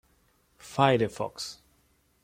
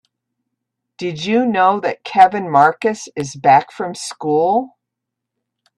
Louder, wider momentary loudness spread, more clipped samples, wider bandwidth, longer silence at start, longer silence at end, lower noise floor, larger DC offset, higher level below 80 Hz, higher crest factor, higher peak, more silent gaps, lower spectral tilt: second, -28 LUFS vs -16 LUFS; about the same, 15 LU vs 13 LU; neither; first, 16 kHz vs 11.5 kHz; second, 0.65 s vs 1 s; second, 0.7 s vs 1.1 s; second, -67 dBFS vs -80 dBFS; neither; about the same, -64 dBFS vs -64 dBFS; first, 24 dB vs 18 dB; second, -6 dBFS vs 0 dBFS; neither; about the same, -5.5 dB/octave vs -5 dB/octave